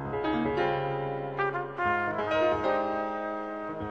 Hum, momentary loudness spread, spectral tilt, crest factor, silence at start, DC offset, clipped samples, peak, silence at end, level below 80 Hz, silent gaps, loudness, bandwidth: none; 7 LU; -7.5 dB/octave; 16 dB; 0 s; under 0.1%; under 0.1%; -14 dBFS; 0 s; -56 dBFS; none; -30 LUFS; 8 kHz